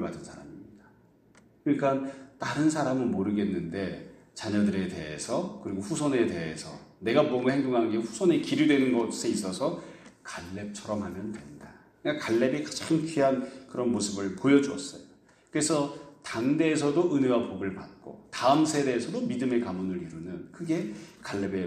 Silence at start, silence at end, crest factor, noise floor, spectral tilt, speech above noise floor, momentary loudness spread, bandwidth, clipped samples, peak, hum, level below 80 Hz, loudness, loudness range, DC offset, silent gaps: 0 s; 0 s; 20 dB; -60 dBFS; -5 dB/octave; 32 dB; 16 LU; 14 kHz; under 0.1%; -8 dBFS; none; -64 dBFS; -28 LUFS; 4 LU; under 0.1%; none